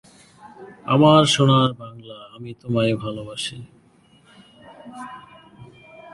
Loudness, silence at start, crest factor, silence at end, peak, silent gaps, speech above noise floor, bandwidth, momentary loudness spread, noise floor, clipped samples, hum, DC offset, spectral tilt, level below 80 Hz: -18 LUFS; 0.45 s; 22 dB; 0.5 s; -2 dBFS; none; 35 dB; 11.5 kHz; 26 LU; -55 dBFS; under 0.1%; none; under 0.1%; -5.5 dB/octave; -56 dBFS